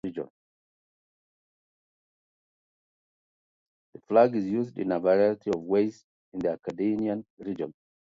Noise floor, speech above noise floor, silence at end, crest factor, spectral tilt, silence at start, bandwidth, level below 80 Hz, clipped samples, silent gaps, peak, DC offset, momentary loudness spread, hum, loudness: under -90 dBFS; over 63 dB; 0.3 s; 22 dB; -8 dB/octave; 0.05 s; 7.6 kHz; -68 dBFS; under 0.1%; 0.30-3.93 s, 6.04-6.32 s, 7.30-7.37 s; -8 dBFS; under 0.1%; 15 LU; none; -27 LUFS